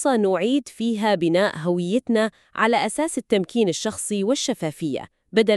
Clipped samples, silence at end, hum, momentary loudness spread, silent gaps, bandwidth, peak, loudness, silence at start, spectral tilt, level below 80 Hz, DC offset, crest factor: under 0.1%; 0 s; none; 6 LU; none; 13 kHz; -4 dBFS; -22 LUFS; 0 s; -4.5 dB/octave; -64 dBFS; under 0.1%; 18 dB